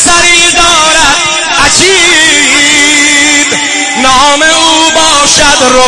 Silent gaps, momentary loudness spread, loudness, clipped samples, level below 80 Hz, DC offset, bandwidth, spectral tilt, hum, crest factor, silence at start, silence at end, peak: none; 4 LU; -3 LUFS; 5%; -28 dBFS; 0.9%; 12 kHz; -0.5 dB/octave; none; 6 dB; 0 s; 0 s; 0 dBFS